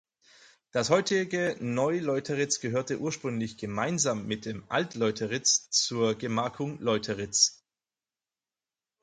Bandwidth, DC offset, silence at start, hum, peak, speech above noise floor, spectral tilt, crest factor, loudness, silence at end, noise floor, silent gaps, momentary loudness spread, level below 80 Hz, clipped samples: 11 kHz; under 0.1%; 0.75 s; none; -8 dBFS; over 61 dB; -3 dB/octave; 22 dB; -28 LUFS; 1.5 s; under -90 dBFS; none; 9 LU; -66 dBFS; under 0.1%